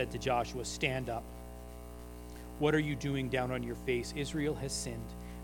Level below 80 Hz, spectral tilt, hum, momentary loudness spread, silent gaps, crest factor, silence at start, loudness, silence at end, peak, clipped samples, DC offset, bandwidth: -48 dBFS; -5 dB/octave; 60 Hz at -50 dBFS; 17 LU; none; 22 dB; 0 s; -35 LUFS; 0 s; -14 dBFS; under 0.1%; under 0.1%; 19 kHz